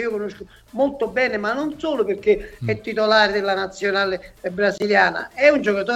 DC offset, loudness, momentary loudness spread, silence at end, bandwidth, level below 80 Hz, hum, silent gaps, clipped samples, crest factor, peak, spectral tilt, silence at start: under 0.1%; -20 LUFS; 10 LU; 0 s; 13 kHz; -50 dBFS; none; none; under 0.1%; 18 dB; -2 dBFS; -5 dB/octave; 0 s